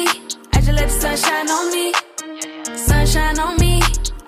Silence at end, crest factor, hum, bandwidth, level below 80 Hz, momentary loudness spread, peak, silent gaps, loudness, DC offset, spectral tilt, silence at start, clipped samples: 0.05 s; 14 dB; none; 16 kHz; -20 dBFS; 11 LU; -4 dBFS; none; -18 LUFS; under 0.1%; -4 dB/octave; 0 s; under 0.1%